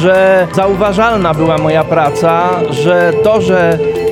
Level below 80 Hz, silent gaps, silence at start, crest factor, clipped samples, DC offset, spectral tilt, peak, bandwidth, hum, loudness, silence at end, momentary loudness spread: -36 dBFS; none; 0 s; 10 dB; under 0.1%; under 0.1%; -6.5 dB/octave; 0 dBFS; 16 kHz; none; -10 LUFS; 0 s; 3 LU